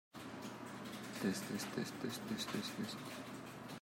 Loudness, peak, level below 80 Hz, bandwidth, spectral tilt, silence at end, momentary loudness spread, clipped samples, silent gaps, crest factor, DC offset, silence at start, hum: -44 LUFS; -26 dBFS; -80 dBFS; 16 kHz; -4 dB/octave; 0 s; 9 LU; under 0.1%; none; 18 dB; under 0.1%; 0.15 s; none